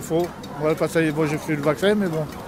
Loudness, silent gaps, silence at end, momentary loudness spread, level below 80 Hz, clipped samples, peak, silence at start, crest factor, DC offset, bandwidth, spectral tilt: -22 LUFS; none; 0 s; 5 LU; -50 dBFS; under 0.1%; -6 dBFS; 0 s; 16 dB; under 0.1%; 16 kHz; -6 dB/octave